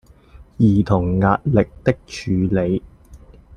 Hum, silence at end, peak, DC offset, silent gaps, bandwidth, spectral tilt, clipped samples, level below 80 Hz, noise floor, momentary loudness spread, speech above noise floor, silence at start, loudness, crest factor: none; 0.4 s; -2 dBFS; under 0.1%; none; 9.6 kHz; -8.5 dB/octave; under 0.1%; -40 dBFS; -45 dBFS; 7 LU; 28 dB; 0.35 s; -19 LUFS; 18 dB